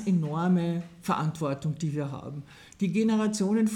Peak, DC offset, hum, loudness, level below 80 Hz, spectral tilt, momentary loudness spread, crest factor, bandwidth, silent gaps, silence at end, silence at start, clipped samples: -14 dBFS; under 0.1%; none; -28 LUFS; -64 dBFS; -7 dB/octave; 13 LU; 14 dB; 14 kHz; none; 0 s; 0 s; under 0.1%